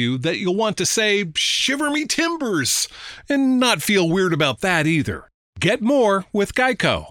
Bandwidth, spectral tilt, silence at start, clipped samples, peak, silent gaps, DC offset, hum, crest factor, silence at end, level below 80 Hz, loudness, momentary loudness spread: 17 kHz; -3.5 dB/octave; 0 s; under 0.1%; -2 dBFS; 5.34-5.53 s; under 0.1%; none; 16 dB; 0 s; -50 dBFS; -19 LUFS; 5 LU